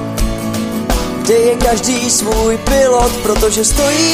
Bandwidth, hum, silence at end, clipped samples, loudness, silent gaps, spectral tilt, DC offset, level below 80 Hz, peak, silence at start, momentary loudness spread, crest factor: 15.5 kHz; none; 0 s; under 0.1%; -13 LUFS; none; -3.5 dB/octave; 0.4%; -22 dBFS; 0 dBFS; 0 s; 7 LU; 12 dB